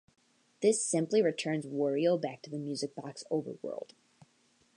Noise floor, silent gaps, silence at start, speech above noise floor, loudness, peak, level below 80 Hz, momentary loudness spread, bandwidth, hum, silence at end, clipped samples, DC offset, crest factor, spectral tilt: -69 dBFS; none; 0.6 s; 38 dB; -32 LUFS; -16 dBFS; -86 dBFS; 13 LU; 11 kHz; none; 0.95 s; under 0.1%; under 0.1%; 18 dB; -4.5 dB/octave